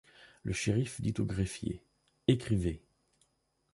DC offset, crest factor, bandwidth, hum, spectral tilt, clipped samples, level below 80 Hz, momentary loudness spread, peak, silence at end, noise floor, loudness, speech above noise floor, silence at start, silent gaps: under 0.1%; 22 dB; 11.5 kHz; none; -6 dB/octave; under 0.1%; -50 dBFS; 12 LU; -12 dBFS; 0.95 s; -77 dBFS; -34 LUFS; 45 dB; 0.2 s; none